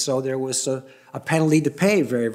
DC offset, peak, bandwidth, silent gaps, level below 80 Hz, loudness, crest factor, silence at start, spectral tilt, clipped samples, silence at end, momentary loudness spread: under 0.1%; -6 dBFS; 16 kHz; none; -66 dBFS; -21 LUFS; 16 dB; 0 s; -5 dB/octave; under 0.1%; 0 s; 12 LU